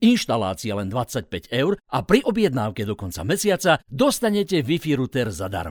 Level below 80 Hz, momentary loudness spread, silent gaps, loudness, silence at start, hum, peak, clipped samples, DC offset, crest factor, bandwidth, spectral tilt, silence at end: -48 dBFS; 9 LU; none; -22 LUFS; 0 s; none; 0 dBFS; under 0.1%; under 0.1%; 20 dB; over 20 kHz; -5 dB/octave; 0 s